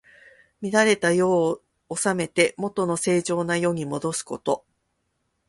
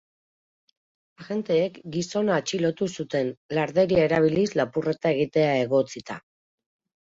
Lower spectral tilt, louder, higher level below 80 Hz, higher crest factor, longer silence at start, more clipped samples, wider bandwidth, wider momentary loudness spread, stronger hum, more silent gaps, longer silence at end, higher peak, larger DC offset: second, -4.5 dB/octave vs -6 dB/octave; about the same, -23 LUFS vs -24 LUFS; about the same, -64 dBFS vs -60 dBFS; about the same, 20 dB vs 18 dB; second, 0.6 s vs 1.2 s; neither; first, 11.5 kHz vs 7.8 kHz; about the same, 9 LU vs 11 LU; neither; second, none vs 3.37-3.49 s; about the same, 0.9 s vs 0.9 s; first, -4 dBFS vs -8 dBFS; neither